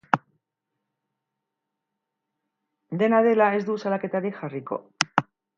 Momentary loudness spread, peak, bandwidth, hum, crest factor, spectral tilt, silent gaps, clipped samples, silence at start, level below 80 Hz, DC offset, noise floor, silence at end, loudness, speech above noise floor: 14 LU; 0 dBFS; 9 kHz; none; 26 dB; -5 dB/octave; none; under 0.1%; 0.15 s; -70 dBFS; under 0.1%; -83 dBFS; 0.35 s; -24 LUFS; 60 dB